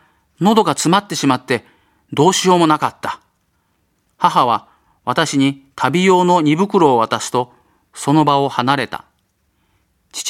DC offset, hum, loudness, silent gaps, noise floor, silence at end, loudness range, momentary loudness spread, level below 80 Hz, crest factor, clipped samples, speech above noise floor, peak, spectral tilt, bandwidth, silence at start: under 0.1%; none; -15 LUFS; none; -64 dBFS; 0 s; 3 LU; 13 LU; -60 dBFS; 16 dB; under 0.1%; 49 dB; 0 dBFS; -4.5 dB/octave; 16 kHz; 0.4 s